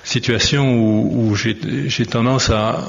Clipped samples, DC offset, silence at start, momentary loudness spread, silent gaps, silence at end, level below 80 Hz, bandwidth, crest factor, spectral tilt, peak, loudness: under 0.1%; under 0.1%; 0.05 s; 5 LU; none; 0 s; -36 dBFS; 7.6 kHz; 14 dB; -5 dB/octave; -2 dBFS; -17 LUFS